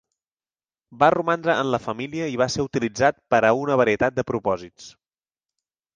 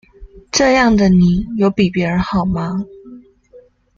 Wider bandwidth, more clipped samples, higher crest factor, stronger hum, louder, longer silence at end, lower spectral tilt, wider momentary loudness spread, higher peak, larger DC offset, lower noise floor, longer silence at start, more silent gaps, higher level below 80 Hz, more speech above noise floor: first, 9.6 kHz vs 7.4 kHz; neither; first, 20 dB vs 14 dB; neither; second, -22 LUFS vs -15 LUFS; first, 1.05 s vs 0.4 s; about the same, -5 dB/octave vs -5.5 dB/octave; about the same, 9 LU vs 10 LU; about the same, -4 dBFS vs -2 dBFS; neither; first, under -90 dBFS vs -46 dBFS; first, 0.9 s vs 0.2 s; neither; second, -54 dBFS vs -36 dBFS; first, over 68 dB vs 32 dB